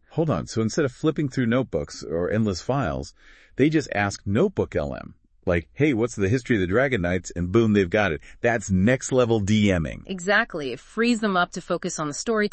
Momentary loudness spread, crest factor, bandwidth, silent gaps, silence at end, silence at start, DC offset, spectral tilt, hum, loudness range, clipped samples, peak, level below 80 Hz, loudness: 8 LU; 16 dB; 8.8 kHz; none; 0.05 s; 0.1 s; under 0.1%; -6 dB/octave; none; 3 LU; under 0.1%; -6 dBFS; -48 dBFS; -24 LUFS